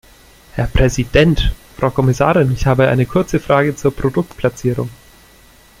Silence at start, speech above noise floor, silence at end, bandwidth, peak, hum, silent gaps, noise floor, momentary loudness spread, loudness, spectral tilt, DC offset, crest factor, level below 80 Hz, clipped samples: 0.55 s; 31 dB; 0.85 s; 15.5 kHz; 0 dBFS; none; none; -46 dBFS; 8 LU; -16 LUFS; -6.5 dB/octave; under 0.1%; 16 dB; -26 dBFS; under 0.1%